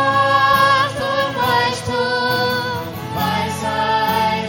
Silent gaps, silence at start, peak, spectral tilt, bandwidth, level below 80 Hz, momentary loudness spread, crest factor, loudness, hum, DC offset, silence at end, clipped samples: none; 0 s; -2 dBFS; -4 dB/octave; 17 kHz; -48 dBFS; 8 LU; 16 dB; -17 LUFS; none; under 0.1%; 0 s; under 0.1%